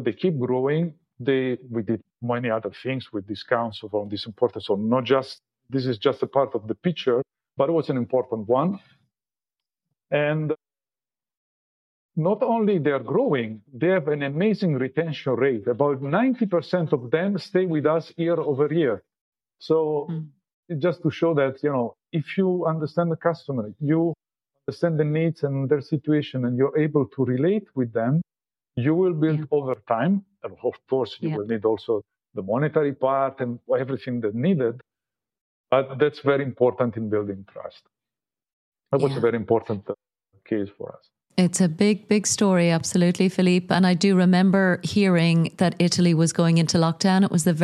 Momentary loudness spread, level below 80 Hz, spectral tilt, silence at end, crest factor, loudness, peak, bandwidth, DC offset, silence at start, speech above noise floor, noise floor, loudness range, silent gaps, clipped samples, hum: 11 LU; -68 dBFS; -6 dB/octave; 0 s; 20 dB; -23 LUFS; -4 dBFS; 12.5 kHz; under 0.1%; 0 s; over 68 dB; under -90 dBFS; 7 LU; 11.37-12.09 s, 19.21-19.32 s, 20.54-20.63 s, 35.41-35.64 s, 38.53-38.72 s; under 0.1%; none